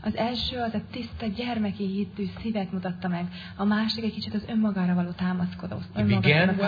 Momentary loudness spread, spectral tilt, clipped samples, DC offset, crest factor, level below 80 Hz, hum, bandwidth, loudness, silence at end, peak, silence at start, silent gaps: 10 LU; -8 dB/octave; under 0.1%; under 0.1%; 20 dB; -50 dBFS; none; 5 kHz; -27 LUFS; 0 s; -6 dBFS; 0 s; none